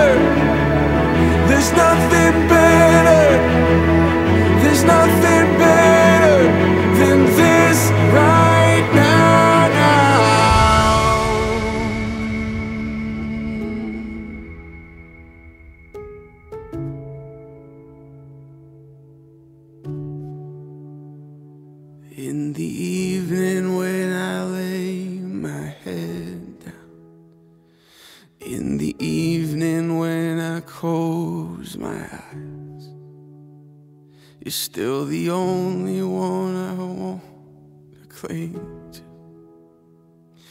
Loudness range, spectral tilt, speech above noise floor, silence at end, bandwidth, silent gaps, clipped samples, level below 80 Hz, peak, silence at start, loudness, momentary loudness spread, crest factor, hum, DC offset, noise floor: 24 LU; -5.5 dB/octave; 35 dB; 1.55 s; 16 kHz; none; under 0.1%; -34 dBFS; 0 dBFS; 0 s; -15 LUFS; 22 LU; 16 dB; none; under 0.1%; -52 dBFS